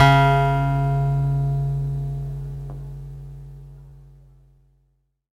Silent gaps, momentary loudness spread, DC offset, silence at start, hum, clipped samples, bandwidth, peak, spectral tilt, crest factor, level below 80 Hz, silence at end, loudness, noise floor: none; 22 LU; under 0.1%; 0 s; none; under 0.1%; 7.6 kHz; 0 dBFS; -7.5 dB/octave; 22 dB; -36 dBFS; 1.35 s; -21 LUFS; -67 dBFS